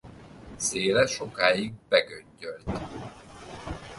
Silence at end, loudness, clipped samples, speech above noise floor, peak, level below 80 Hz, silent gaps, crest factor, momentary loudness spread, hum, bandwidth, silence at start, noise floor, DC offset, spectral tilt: 0 s; -26 LUFS; under 0.1%; 19 dB; -4 dBFS; -50 dBFS; none; 24 dB; 21 LU; none; 11.5 kHz; 0.05 s; -46 dBFS; under 0.1%; -3 dB/octave